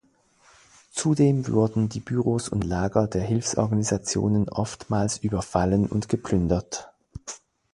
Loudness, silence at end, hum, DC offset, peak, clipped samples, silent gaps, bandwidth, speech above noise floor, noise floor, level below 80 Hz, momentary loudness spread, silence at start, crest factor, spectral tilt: -25 LUFS; 0.35 s; none; under 0.1%; -4 dBFS; under 0.1%; none; 11.5 kHz; 37 dB; -60 dBFS; -44 dBFS; 14 LU; 0.95 s; 20 dB; -6 dB/octave